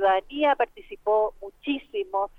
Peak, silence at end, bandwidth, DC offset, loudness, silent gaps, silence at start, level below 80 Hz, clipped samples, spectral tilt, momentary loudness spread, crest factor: -10 dBFS; 0.1 s; 4.8 kHz; under 0.1%; -26 LUFS; none; 0 s; -54 dBFS; under 0.1%; -5 dB/octave; 8 LU; 16 dB